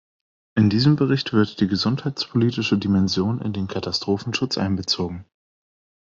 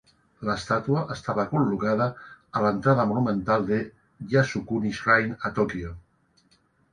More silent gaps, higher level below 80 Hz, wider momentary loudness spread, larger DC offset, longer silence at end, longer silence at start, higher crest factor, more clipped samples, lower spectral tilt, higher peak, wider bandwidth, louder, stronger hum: neither; second, -58 dBFS vs -52 dBFS; second, 8 LU vs 11 LU; neither; second, 0.8 s vs 0.95 s; first, 0.55 s vs 0.4 s; about the same, 18 dB vs 20 dB; neither; about the same, -6 dB/octave vs -7 dB/octave; about the same, -4 dBFS vs -6 dBFS; second, 7.6 kHz vs 10 kHz; first, -22 LUFS vs -25 LUFS; neither